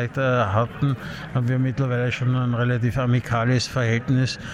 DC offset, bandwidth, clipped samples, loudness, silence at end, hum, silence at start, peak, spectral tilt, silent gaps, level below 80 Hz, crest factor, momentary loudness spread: under 0.1%; 10 kHz; under 0.1%; -22 LUFS; 0 s; none; 0 s; -10 dBFS; -6.5 dB/octave; none; -48 dBFS; 12 dB; 4 LU